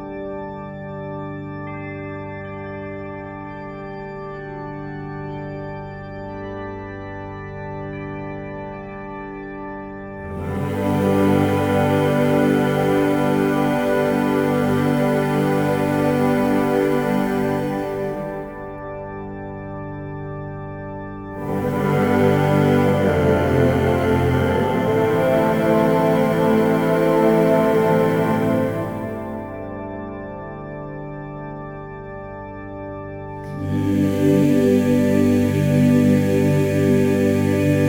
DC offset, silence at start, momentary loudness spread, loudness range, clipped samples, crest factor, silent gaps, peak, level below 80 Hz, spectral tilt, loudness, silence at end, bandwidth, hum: under 0.1%; 0 s; 16 LU; 14 LU; under 0.1%; 16 dB; none; -4 dBFS; -44 dBFS; -7.5 dB/octave; -19 LUFS; 0 s; over 20 kHz; 50 Hz at -50 dBFS